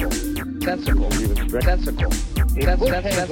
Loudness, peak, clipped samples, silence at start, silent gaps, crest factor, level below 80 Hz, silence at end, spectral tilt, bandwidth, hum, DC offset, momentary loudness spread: -22 LUFS; -6 dBFS; under 0.1%; 0 s; none; 14 dB; -22 dBFS; 0 s; -5 dB/octave; 19 kHz; none; under 0.1%; 5 LU